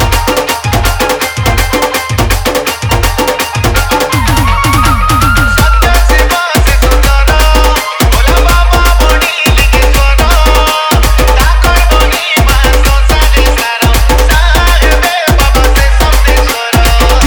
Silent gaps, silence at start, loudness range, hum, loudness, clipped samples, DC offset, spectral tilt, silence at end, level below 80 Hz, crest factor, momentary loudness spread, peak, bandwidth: none; 0 s; 3 LU; none; -8 LUFS; 0.3%; under 0.1%; -4 dB/octave; 0 s; -8 dBFS; 6 dB; 3 LU; 0 dBFS; 19.5 kHz